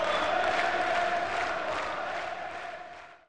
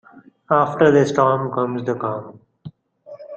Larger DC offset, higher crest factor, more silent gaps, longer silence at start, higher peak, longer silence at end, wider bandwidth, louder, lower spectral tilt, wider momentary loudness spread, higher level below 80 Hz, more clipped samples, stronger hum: first, 0.4% vs under 0.1%; about the same, 14 dB vs 18 dB; neither; second, 0 s vs 0.5 s; second, -16 dBFS vs -2 dBFS; about the same, 0 s vs 0 s; first, 10.5 kHz vs 8.4 kHz; second, -30 LUFS vs -18 LUFS; second, -3 dB/octave vs -7 dB/octave; first, 13 LU vs 10 LU; about the same, -60 dBFS vs -60 dBFS; neither; neither